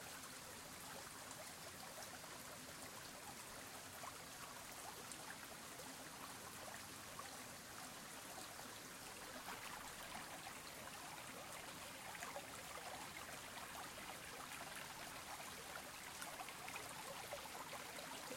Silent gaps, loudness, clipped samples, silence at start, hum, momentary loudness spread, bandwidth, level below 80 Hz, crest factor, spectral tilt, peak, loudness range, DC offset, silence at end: none; -52 LUFS; under 0.1%; 0 s; none; 3 LU; 16.5 kHz; -76 dBFS; 24 dB; -1.5 dB/octave; -30 dBFS; 2 LU; under 0.1%; 0 s